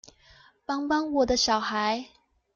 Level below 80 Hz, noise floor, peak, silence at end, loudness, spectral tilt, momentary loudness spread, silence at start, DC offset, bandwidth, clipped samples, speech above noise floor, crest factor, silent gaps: -54 dBFS; -57 dBFS; -12 dBFS; 0.5 s; -26 LUFS; -2.5 dB/octave; 10 LU; 0.7 s; under 0.1%; 7.6 kHz; under 0.1%; 31 dB; 16 dB; none